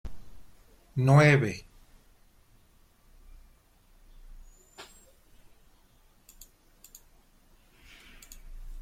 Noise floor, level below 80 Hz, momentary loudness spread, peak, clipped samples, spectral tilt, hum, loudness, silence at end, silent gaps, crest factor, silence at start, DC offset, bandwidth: -61 dBFS; -52 dBFS; 31 LU; -8 dBFS; under 0.1%; -7 dB/octave; none; -23 LUFS; 0 s; none; 24 dB; 0.05 s; under 0.1%; 15 kHz